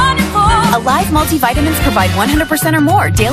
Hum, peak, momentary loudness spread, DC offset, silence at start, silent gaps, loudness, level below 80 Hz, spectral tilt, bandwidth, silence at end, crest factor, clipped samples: none; 0 dBFS; 2 LU; under 0.1%; 0 s; none; -12 LUFS; -24 dBFS; -4.5 dB/octave; 16 kHz; 0 s; 12 dB; under 0.1%